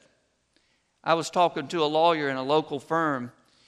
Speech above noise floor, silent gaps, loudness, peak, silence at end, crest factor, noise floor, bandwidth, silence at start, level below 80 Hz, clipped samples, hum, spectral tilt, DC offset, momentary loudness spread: 44 dB; none; -25 LUFS; -8 dBFS; 0.4 s; 20 dB; -69 dBFS; 13 kHz; 1.05 s; -76 dBFS; under 0.1%; none; -4.5 dB/octave; under 0.1%; 9 LU